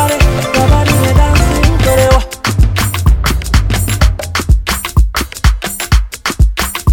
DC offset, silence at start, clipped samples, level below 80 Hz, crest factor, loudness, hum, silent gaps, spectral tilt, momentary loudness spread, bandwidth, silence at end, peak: under 0.1%; 0 s; 0.4%; -14 dBFS; 10 dB; -12 LUFS; none; none; -5 dB/octave; 5 LU; 18 kHz; 0 s; 0 dBFS